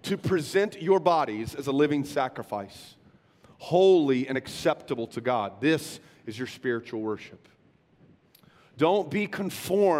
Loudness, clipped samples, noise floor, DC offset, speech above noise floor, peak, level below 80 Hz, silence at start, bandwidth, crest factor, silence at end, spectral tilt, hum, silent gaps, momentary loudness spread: -27 LUFS; under 0.1%; -62 dBFS; under 0.1%; 36 dB; -8 dBFS; -64 dBFS; 0.05 s; 15.5 kHz; 20 dB; 0 s; -5.5 dB/octave; none; none; 15 LU